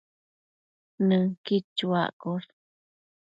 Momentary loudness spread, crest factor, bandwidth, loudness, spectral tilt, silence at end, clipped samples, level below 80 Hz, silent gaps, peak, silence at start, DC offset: 10 LU; 18 dB; 7.4 kHz; -27 LUFS; -8 dB/octave; 0.9 s; under 0.1%; -74 dBFS; 1.37-1.44 s, 1.64-1.76 s, 2.13-2.20 s; -12 dBFS; 1 s; under 0.1%